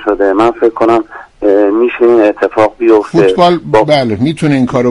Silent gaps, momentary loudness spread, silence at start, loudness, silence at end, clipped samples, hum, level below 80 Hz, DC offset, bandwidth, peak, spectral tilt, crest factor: none; 4 LU; 0 s; -10 LUFS; 0 s; 0.3%; none; -42 dBFS; under 0.1%; 11 kHz; 0 dBFS; -7 dB/octave; 10 dB